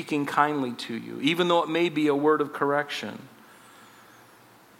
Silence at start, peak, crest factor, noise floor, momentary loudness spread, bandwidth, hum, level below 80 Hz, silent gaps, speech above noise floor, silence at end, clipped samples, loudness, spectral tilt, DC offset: 0 s; -6 dBFS; 20 dB; -54 dBFS; 11 LU; 16.5 kHz; none; -78 dBFS; none; 29 dB; 1.5 s; under 0.1%; -25 LUFS; -5 dB/octave; under 0.1%